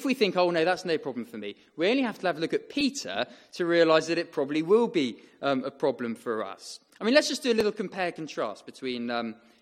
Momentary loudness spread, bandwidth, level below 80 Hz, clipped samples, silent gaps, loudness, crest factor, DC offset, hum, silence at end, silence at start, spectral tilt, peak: 13 LU; 15.5 kHz; -72 dBFS; under 0.1%; none; -27 LUFS; 22 dB; under 0.1%; none; 0.3 s; 0 s; -4 dB/octave; -6 dBFS